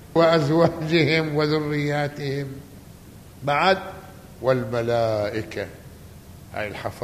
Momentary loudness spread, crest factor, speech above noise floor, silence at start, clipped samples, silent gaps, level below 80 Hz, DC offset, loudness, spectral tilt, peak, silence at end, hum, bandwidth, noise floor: 17 LU; 20 dB; 22 dB; 0 s; under 0.1%; none; -52 dBFS; under 0.1%; -22 LUFS; -6.5 dB/octave; -4 dBFS; 0 s; none; 15 kHz; -44 dBFS